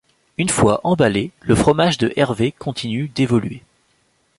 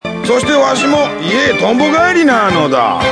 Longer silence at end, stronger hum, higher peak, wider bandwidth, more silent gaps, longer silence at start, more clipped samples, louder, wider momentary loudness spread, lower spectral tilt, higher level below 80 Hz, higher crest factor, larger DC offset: first, 0.8 s vs 0 s; neither; about the same, -2 dBFS vs 0 dBFS; about the same, 11.5 kHz vs 10.5 kHz; neither; first, 0.4 s vs 0.05 s; neither; second, -18 LUFS vs -11 LUFS; first, 9 LU vs 4 LU; about the same, -5.5 dB/octave vs -4.5 dB/octave; about the same, -42 dBFS vs -42 dBFS; about the same, 16 dB vs 12 dB; neither